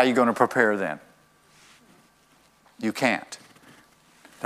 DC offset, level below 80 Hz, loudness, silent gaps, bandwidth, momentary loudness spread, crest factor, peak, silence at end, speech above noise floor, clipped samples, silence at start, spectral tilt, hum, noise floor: under 0.1%; -74 dBFS; -24 LUFS; none; 15.5 kHz; 19 LU; 24 dB; -4 dBFS; 0 s; 37 dB; under 0.1%; 0 s; -4.5 dB/octave; none; -60 dBFS